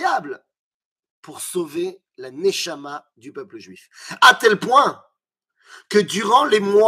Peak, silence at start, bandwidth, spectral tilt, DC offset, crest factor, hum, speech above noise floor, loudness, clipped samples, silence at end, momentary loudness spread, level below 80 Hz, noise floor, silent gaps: 0 dBFS; 0 s; 15.5 kHz; -3 dB/octave; under 0.1%; 20 dB; none; 58 dB; -17 LUFS; under 0.1%; 0 s; 24 LU; -70 dBFS; -77 dBFS; 0.59-0.96 s, 1.10-1.23 s